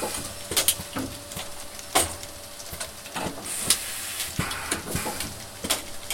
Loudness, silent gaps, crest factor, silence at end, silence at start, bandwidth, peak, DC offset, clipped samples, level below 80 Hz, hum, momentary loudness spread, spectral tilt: -28 LUFS; none; 30 dB; 0 s; 0 s; 17 kHz; 0 dBFS; under 0.1%; under 0.1%; -48 dBFS; none; 12 LU; -1.5 dB/octave